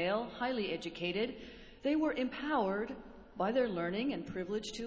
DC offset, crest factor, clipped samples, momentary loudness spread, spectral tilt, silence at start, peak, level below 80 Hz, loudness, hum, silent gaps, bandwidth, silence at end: under 0.1%; 16 dB; under 0.1%; 9 LU; -5.5 dB/octave; 0 s; -20 dBFS; -62 dBFS; -36 LUFS; none; none; 8 kHz; 0 s